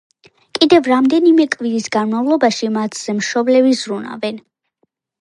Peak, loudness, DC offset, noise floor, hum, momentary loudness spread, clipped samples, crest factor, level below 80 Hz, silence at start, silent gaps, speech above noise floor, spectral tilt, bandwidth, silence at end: 0 dBFS; -15 LUFS; under 0.1%; -66 dBFS; none; 12 LU; under 0.1%; 16 dB; -64 dBFS; 0.55 s; none; 52 dB; -4 dB/octave; 11.5 kHz; 0.8 s